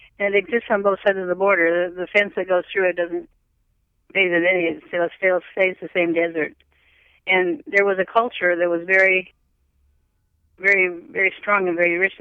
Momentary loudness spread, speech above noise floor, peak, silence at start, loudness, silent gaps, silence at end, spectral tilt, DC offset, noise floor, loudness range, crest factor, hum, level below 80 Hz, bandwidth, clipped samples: 7 LU; 47 dB; -4 dBFS; 0.2 s; -19 LUFS; none; 0.05 s; -6 dB/octave; under 0.1%; -67 dBFS; 2 LU; 18 dB; none; -64 dBFS; 7.8 kHz; under 0.1%